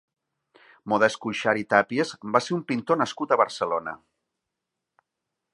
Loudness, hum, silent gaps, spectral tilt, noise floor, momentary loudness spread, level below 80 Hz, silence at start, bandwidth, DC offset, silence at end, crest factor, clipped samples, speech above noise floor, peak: -24 LUFS; none; none; -5 dB/octave; -84 dBFS; 8 LU; -70 dBFS; 0.85 s; 11 kHz; under 0.1%; 1.6 s; 24 dB; under 0.1%; 60 dB; -2 dBFS